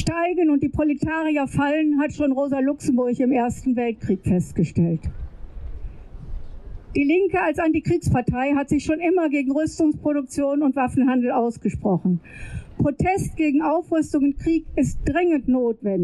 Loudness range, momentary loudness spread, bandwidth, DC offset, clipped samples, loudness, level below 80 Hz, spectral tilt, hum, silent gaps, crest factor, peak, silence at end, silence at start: 4 LU; 16 LU; 12 kHz; under 0.1%; under 0.1%; -22 LUFS; -38 dBFS; -7.5 dB/octave; none; none; 12 dB; -10 dBFS; 0 s; 0 s